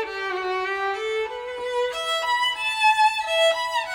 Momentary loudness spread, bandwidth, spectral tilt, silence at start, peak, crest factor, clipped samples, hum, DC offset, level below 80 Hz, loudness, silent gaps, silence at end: 9 LU; over 20 kHz; -0.5 dB/octave; 0 s; -8 dBFS; 16 dB; under 0.1%; none; under 0.1%; -60 dBFS; -23 LUFS; none; 0 s